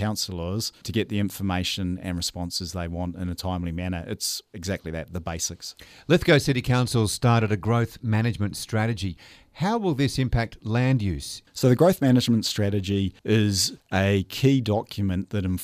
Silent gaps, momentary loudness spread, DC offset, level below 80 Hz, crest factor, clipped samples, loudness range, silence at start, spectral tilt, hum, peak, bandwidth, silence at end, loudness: none; 11 LU; under 0.1%; -46 dBFS; 20 dB; under 0.1%; 7 LU; 0 s; -5.5 dB/octave; none; -4 dBFS; 16 kHz; 0 s; -25 LUFS